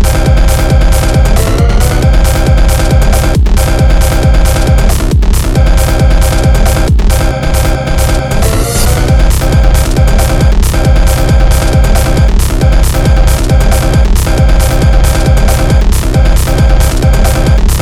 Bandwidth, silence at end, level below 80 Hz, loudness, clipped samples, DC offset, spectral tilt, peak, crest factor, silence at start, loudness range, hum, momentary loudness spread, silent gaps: 16 kHz; 0 s; -8 dBFS; -9 LUFS; 1%; 1%; -5.5 dB/octave; 0 dBFS; 6 dB; 0 s; 1 LU; none; 2 LU; none